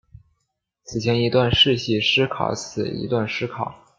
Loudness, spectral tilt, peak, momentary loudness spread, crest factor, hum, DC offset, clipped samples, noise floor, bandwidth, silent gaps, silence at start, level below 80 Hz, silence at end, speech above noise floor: -20 LUFS; -5 dB/octave; -4 dBFS; 11 LU; 18 dB; none; under 0.1%; under 0.1%; -76 dBFS; 7.6 kHz; none; 0.9 s; -48 dBFS; 0.25 s; 55 dB